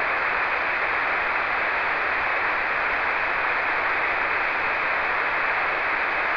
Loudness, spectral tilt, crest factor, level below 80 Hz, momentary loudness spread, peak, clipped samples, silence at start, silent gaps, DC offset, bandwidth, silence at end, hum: -22 LUFS; -4 dB/octave; 12 dB; -50 dBFS; 0 LU; -12 dBFS; under 0.1%; 0 s; none; under 0.1%; 5.4 kHz; 0 s; none